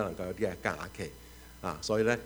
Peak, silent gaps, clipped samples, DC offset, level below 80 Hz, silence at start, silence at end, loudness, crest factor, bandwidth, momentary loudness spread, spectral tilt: -12 dBFS; none; under 0.1%; under 0.1%; -54 dBFS; 0 s; 0 s; -35 LUFS; 22 dB; over 20 kHz; 15 LU; -5 dB/octave